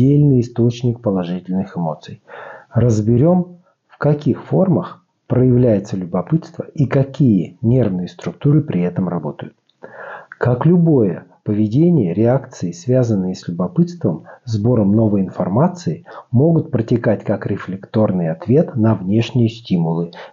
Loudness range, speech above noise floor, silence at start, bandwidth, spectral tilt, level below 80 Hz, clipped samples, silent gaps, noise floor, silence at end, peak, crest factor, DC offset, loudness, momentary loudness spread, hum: 2 LU; 21 dB; 0 s; 7.4 kHz; -9 dB/octave; -48 dBFS; under 0.1%; none; -37 dBFS; 0.05 s; -4 dBFS; 14 dB; under 0.1%; -17 LUFS; 12 LU; none